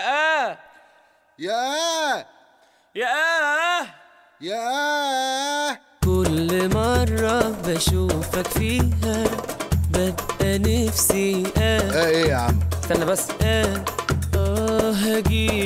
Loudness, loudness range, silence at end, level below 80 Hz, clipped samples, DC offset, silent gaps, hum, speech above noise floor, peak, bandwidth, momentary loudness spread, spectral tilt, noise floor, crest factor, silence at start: -21 LUFS; 3 LU; 0 s; -32 dBFS; under 0.1%; under 0.1%; none; none; 36 dB; -4 dBFS; 16.5 kHz; 6 LU; -4.5 dB/octave; -57 dBFS; 18 dB; 0 s